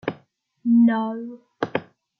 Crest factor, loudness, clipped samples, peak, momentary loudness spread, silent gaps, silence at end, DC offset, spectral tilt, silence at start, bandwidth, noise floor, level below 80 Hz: 18 dB; -22 LUFS; under 0.1%; -6 dBFS; 16 LU; none; 0.35 s; under 0.1%; -8 dB/octave; 0.05 s; 5.2 kHz; -58 dBFS; -74 dBFS